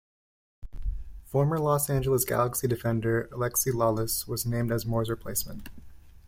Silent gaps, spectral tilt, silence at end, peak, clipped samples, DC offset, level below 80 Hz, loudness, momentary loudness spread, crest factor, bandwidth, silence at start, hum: none; -5 dB/octave; 0.1 s; -12 dBFS; under 0.1%; under 0.1%; -44 dBFS; -27 LUFS; 14 LU; 16 dB; 16.5 kHz; 0.6 s; none